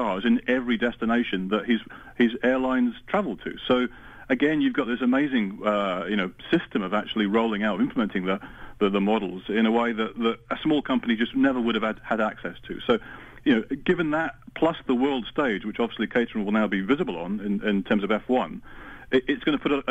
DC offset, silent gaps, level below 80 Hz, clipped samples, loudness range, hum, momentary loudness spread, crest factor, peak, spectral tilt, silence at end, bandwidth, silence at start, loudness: under 0.1%; none; -52 dBFS; under 0.1%; 1 LU; none; 6 LU; 14 dB; -10 dBFS; -7.5 dB/octave; 0 s; 8 kHz; 0 s; -25 LUFS